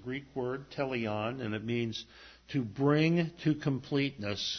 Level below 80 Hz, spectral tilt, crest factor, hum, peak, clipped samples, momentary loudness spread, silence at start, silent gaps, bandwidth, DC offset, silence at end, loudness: -62 dBFS; -6.5 dB/octave; 18 dB; none; -14 dBFS; under 0.1%; 10 LU; 0 s; none; 6.6 kHz; under 0.1%; 0 s; -33 LUFS